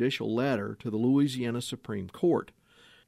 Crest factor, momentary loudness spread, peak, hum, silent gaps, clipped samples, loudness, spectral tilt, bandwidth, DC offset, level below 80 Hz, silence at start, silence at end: 14 dB; 11 LU; -14 dBFS; none; none; under 0.1%; -29 LUFS; -6.5 dB/octave; 15 kHz; under 0.1%; -68 dBFS; 0 s; 0.65 s